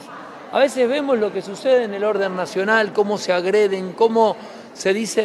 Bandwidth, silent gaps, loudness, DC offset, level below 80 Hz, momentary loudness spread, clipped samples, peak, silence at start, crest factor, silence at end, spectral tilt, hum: 13 kHz; none; -19 LUFS; under 0.1%; -72 dBFS; 7 LU; under 0.1%; -2 dBFS; 0 s; 16 dB; 0 s; -4 dB/octave; none